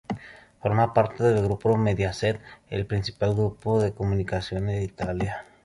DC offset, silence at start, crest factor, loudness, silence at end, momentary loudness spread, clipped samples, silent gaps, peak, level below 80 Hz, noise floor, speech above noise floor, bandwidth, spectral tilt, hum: under 0.1%; 0.1 s; 20 dB; -26 LUFS; 0.2 s; 9 LU; under 0.1%; none; -6 dBFS; -44 dBFS; -45 dBFS; 21 dB; 11.5 kHz; -7 dB/octave; none